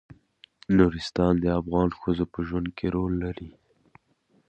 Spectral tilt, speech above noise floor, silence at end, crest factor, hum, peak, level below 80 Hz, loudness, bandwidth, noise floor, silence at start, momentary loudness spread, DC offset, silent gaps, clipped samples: -8 dB/octave; 42 dB; 1 s; 22 dB; none; -6 dBFS; -42 dBFS; -26 LUFS; 8.6 kHz; -66 dBFS; 0.1 s; 13 LU; under 0.1%; none; under 0.1%